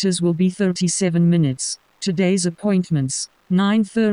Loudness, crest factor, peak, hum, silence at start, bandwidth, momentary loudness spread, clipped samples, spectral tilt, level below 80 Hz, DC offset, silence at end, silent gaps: -19 LUFS; 12 dB; -6 dBFS; none; 0 s; 10.5 kHz; 8 LU; under 0.1%; -5.5 dB/octave; -58 dBFS; under 0.1%; 0 s; none